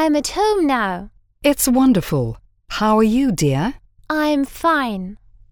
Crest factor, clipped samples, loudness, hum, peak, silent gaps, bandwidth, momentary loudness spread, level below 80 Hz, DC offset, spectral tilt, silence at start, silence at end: 16 dB; under 0.1%; -18 LUFS; none; -4 dBFS; none; over 20 kHz; 13 LU; -40 dBFS; under 0.1%; -5 dB/octave; 0 s; 0.35 s